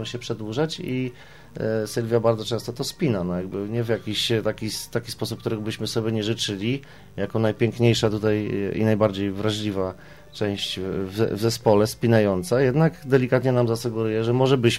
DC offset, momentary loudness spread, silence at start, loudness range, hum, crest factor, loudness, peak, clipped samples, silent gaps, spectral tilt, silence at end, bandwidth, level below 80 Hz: 0.3%; 9 LU; 0 s; 5 LU; none; 18 dB; -24 LUFS; -4 dBFS; under 0.1%; none; -6 dB/octave; 0 s; 16 kHz; -52 dBFS